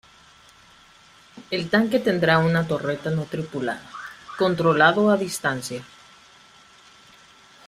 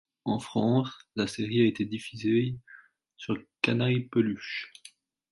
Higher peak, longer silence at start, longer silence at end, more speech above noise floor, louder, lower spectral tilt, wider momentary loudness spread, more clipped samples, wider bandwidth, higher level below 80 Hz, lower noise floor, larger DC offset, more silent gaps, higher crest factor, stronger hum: first, -4 dBFS vs -8 dBFS; first, 1.35 s vs 0.25 s; first, 1.8 s vs 0.65 s; about the same, 31 dB vs 28 dB; first, -22 LUFS vs -29 LUFS; about the same, -5.5 dB/octave vs -6.5 dB/octave; first, 16 LU vs 11 LU; neither; first, 15 kHz vs 11.5 kHz; first, -60 dBFS vs -66 dBFS; second, -52 dBFS vs -56 dBFS; neither; neither; about the same, 20 dB vs 20 dB; neither